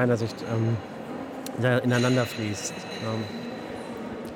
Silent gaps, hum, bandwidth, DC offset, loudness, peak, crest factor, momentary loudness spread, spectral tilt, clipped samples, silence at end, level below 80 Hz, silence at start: none; none; 18 kHz; under 0.1%; -28 LUFS; -10 dBFS; 18 dB; 13 LU; -5.5 dB/octave; under 0.1%; 0 s; -64 dBFS; 0 s